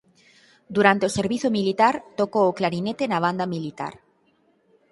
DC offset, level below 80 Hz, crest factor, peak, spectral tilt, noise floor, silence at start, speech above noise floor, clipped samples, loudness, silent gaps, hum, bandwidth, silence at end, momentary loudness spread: under 0.1%; -62 dBFS; 24 dB; 0 dBFS; -5.5 dB/octave; -64 dBFS; 0.7 s; 42 dB; under 0.1%; -22 LUFS; none; none; 11.5 kHz; 1 s; 11 LU